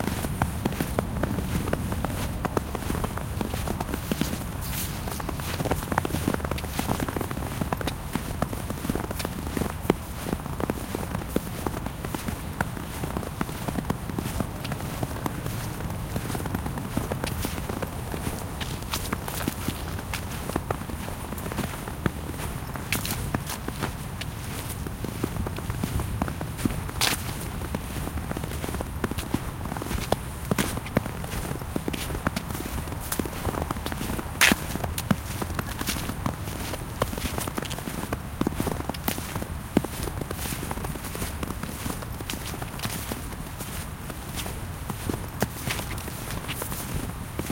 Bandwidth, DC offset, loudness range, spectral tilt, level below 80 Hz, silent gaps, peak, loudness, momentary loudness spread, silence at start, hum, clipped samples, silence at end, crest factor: 17 kHz; under 0.1%; 5 LU; -4.5 dB/octave; -38 dBFS; none; -2 dBFS; -30 LUFS; 5 LU; 0 s; none; under 0.1%; 0 s; 28 dB